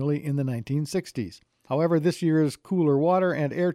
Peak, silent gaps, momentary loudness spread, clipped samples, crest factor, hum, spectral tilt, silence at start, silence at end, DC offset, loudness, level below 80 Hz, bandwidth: -12 dBFS; none; 9 LU; under 0.1%; 14 dB; none; -7.5 dB/octave; 0 s; 0 s; under 0.1%; -25 LUFS; -66 dBFS; 14 kHz